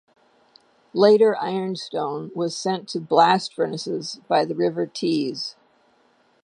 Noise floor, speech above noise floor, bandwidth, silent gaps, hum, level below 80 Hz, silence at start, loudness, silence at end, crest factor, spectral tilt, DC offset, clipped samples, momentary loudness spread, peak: -61 dBFS; 40 dB; 11 kHz; none; none; -76 dBFS; 0.95 s; -22 LUFS; 0.9 s; 20 dB; -5 dB/octave; under 0.1%; under 0.1%; 12 LU; -2 dBFS